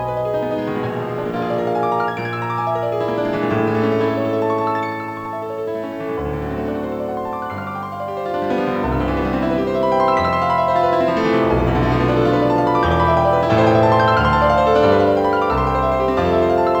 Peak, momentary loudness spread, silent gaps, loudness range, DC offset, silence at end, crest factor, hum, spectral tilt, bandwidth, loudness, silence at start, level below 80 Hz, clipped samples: -2 dBFS; 11 LU; none; 8 LU; under 0.1%; 0 s; 16 dB; none; -7.5 dB/octave; over 20 kHz; -18 LUFS; 0 s; -34 dBFS; under 0.1%